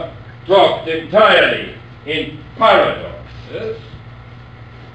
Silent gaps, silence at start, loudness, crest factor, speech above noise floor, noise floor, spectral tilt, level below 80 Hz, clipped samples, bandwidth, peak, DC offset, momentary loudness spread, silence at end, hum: none; 0 s; -14 LUFS; 16 dB; 22 dB; -36 dBFS; -5.5 dB/octave; -44 dBFS; under 0.1%; 8.4 kHz; 0 dBFS; 0.2%; 21 LU; 0.05 s; none